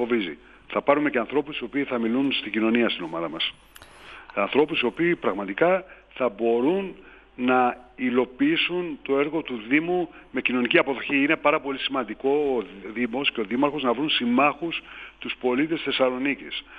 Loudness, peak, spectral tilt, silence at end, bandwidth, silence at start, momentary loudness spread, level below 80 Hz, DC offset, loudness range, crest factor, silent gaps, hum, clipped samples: -24 LUFS; -4 dBFS; -7 dB/octave; 0 s; 11 kHz; 0 s; 9 LU; -60 dBFS; under 0.1%; 2 LU; 20 dB; none; none; under 0.1%